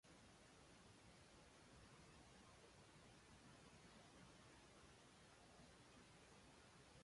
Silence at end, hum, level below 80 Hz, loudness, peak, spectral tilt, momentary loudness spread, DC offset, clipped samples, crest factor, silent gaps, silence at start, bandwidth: 0 s; none; -78 dBFS; -67 LUFS; -54 dBFS; -3.5 dB/octave; 1 LU; under 0.1%; under 0.1%; 14 dB; none; 0.05 s; 11.5 kHz